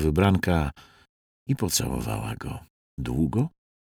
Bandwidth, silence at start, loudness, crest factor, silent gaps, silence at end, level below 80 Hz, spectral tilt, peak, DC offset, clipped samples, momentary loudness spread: 19 kHz; 0 s; -26 LUFS; 18 dB; 1.09-1.46 s, 2.70-2.97 s; 0.4 s; -40 dBFS; -5.5 dB/octave; -8 dBFS; under 0.1%; under 0.1%; 16 LU